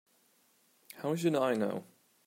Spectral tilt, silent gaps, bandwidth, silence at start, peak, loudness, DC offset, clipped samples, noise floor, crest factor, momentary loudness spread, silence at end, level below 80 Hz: -6 dB/octave; none; 16 kHz; 0.95 s; -18 dBFS; -33 LUFS; under 0.1%; under 0.1%; -70 dBFS; 18 dB; 13 LU; 0.45 s; -86 dBFS